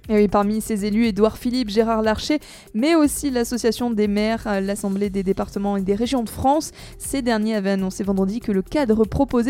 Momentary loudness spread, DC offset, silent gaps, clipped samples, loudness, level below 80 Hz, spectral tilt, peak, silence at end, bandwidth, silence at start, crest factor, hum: 6 LU; under 0.1%; none; under 0.1%; -21 LUFS; -40 dBFS; -5.5 dB/octave; -2 dBFS; 0 s; 16.5 kHz; 0.05 s; 18 dB; none